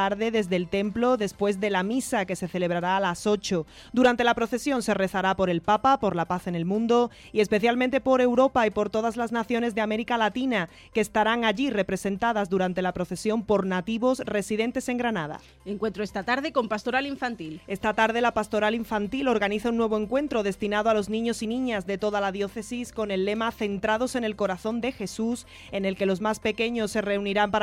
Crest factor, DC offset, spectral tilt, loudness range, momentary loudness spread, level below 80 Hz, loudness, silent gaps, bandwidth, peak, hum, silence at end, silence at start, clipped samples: 16 dB; under 0.1%; -5 dB/octave; 4 LU; 7 LU; -54 dBFS; -26 LUFS; none; 16 kHz; -10 dBFS; none; 0 s; 0 s; under 0.1%